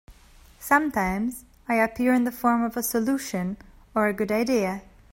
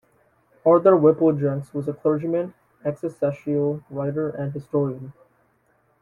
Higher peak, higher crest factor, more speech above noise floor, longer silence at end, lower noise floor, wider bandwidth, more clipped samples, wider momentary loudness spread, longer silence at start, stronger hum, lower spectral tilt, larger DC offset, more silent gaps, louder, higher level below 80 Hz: about the same, -6 dBFS vs -4 dBFS; about the same, 20 dB vs 20 dB; second, 28 dB vs 43 dB; second, 0.3 s vs 0.9 s; second, -52 dBFS vs -64 dBFS; first, 16.5 kHz vs 11 kHz; neither; second, 11 LU vs 14 LU; second, 0.1 s vs 0.65 s; neither; second, -5 dB/octave vs -11 dB/octave; neither; neither; second, -25 LUFS vs -22 LUFS; first, -52 dBFS vs -64 dBFS